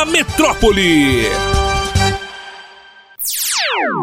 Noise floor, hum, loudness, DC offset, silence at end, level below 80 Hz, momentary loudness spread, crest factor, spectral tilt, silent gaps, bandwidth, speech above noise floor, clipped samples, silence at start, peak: -42 dBFS; none; -14 LUFS; under 0.1%; 0 s; -26 dBFS; 13 LU; 16 dB; -3.5 dB/octave; none; 16.5 kHz; 29 dB; under 0.1%; 0 s; 0 dBFS